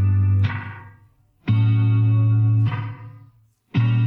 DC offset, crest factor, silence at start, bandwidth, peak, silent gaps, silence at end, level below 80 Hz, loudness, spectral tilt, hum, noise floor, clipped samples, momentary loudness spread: under 0.1%; 10 dB; 0 s; 4.2 kHz; -8 dBFS; none; 0 s; -54 dBFS; -20 LUFS; -10 dB/octave; none; -56 dBFS; under 0.1%; 16 LU